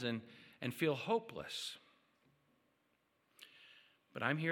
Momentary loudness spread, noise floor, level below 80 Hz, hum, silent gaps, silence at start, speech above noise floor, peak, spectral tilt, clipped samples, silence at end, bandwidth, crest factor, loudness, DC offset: 23 LU; -79 dBFS; -82 dBFS; none; none; 0 s; 40 dB; -18 dBFS; -5 dB/octave; under 0.1%; 0 s; 17.5 kHz; 24 dB; -40 LUFS; under 0.1%